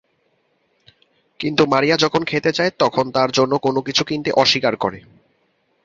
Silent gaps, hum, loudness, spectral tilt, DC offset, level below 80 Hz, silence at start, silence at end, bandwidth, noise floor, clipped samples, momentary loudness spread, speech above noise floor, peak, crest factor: none; none; -18 LUFS; -4.5 dB/octave; under 0.1%; -56 dBFS; 1.4 s; 0.85 s; 7.8 kHz; -65 dBFS; under 0.1%; 6 LU; 47 dB; 0 dBFS; 18 dB